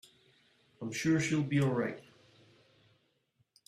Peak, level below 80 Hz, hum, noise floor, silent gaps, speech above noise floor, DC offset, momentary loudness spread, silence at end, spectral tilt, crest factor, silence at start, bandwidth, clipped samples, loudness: -18 dBFS; -70 dBFS; none; -76 dBFS; none; 45 dB; under 0.1%; 13 LU; 1.7 s; -6 dB/octave; 18 dB; 0.8 s; 13.5 kHz; under 0.1%; -32 LUFS